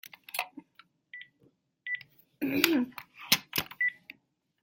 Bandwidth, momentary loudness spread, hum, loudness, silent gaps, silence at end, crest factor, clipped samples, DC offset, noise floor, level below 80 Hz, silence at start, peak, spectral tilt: 16.5 kHz; 21 LU; none; -30 LUFS; none; 0.7 s; 32 dB; under 0.1%; under 0.1%; -72 dBFS; -72 dBFS; 0.35 s; -2 dBFS; -2 dB/octave